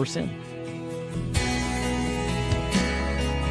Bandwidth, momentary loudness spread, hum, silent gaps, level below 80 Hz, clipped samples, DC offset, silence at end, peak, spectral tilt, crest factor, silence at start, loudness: 11 kHz; 9 LU; none; none; -34 dBFS; under 0.1%; under 0.1%; 0 s; -12 dBFS; -5 dB/octave; 16 dB; 0 s; -27 LUFS